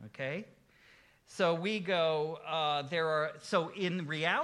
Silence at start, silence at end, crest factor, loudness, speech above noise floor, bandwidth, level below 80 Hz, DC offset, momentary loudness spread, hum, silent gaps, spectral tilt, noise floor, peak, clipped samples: 0 s; 0 s; 18 dB; -33 LUFS; 30 dB; 12 kHz; -78 dBFS; under 0.1%; 8 LU; none; none; -5 dB/octave; -63 dBFS; -16 dBFS; under 0.1%